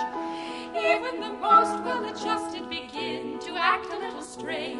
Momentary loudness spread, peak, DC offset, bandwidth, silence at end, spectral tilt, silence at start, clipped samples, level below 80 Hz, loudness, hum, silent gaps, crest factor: 14 LU; -8 dBFS; under 0.1%; 11.5 kHz; 0 s; -3 dB/octave; 0 s; under 0.1%; -64 dBFS; -27 LUFS; none; none; 20 dB